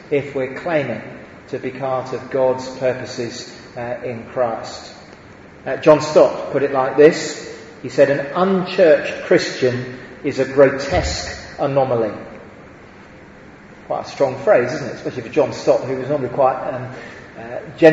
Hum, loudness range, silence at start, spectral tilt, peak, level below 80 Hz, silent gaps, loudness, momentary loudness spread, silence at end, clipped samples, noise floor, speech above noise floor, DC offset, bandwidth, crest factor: none; 8 LU; 0 s; -5.5 dB/octave; 0 dBFS; -44 dBFS; none; -18 LUFS; 18 LU; 0 s; under 0.1%; -41 dBFS; 23 dB; under 0.1%; 8 kHz; 18 dB